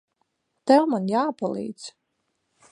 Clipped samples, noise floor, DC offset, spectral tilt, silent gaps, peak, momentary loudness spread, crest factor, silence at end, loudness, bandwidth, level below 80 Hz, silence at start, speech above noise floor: under 0.1%; -76 dBFS; under 0.1%; -6 dB/octave; none; -4 dBFS; 19 LU; 20 dB; 0.85 s; -23 LUFS; 10.5 kHz; -76 dBFS; 0.65 s; 53 dB